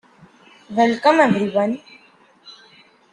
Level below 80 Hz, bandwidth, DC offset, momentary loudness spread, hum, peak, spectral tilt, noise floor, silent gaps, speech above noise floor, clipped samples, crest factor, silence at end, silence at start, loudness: -66 dBFS; 10.5 kHz; under 0.1%; 11 LU; none; -2 dBFS; -6 dB/octave; -53 dBFS; none; 36 dB; under 0.1%; 20 dB; 0.6 s; 0.7 s; -18 LUFS